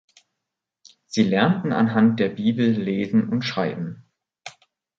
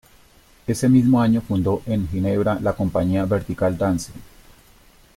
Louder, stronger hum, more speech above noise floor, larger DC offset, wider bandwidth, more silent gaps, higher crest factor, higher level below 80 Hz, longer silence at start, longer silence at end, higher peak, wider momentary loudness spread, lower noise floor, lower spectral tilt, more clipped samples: about the same, -21 LUFS vs -20 LUFS; neither; first, 63 dB vs 33 dB; neither; second, 7.6 kHz vs 16 kHz; neither; about the same, 18 dB vs 16 dB; second, -62 dBFS vs -44 dBFS; first, 1.1 s vs 0.7 s; second, 0.5 s vs 0.9 s; about the same, -4 dBFS vs -4 dBFS; first, 20 LU vs 9 LU; first, -83 dBFS vs -52 dBFS; about the same, -6.5 dB/octave vs -7.5 dB/octave; neither